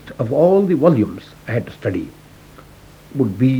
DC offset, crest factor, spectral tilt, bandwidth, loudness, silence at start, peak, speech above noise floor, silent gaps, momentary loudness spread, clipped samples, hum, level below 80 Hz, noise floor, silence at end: under 0.1%; 18 dB; -9 dB/octave; 18.5 kHz; -18 LUFS; 0.05 s; 0 dBFS; 27 dB; none; 15 LU; under 0.1%; none; -50 dBFS; -43 dBFS; 0 s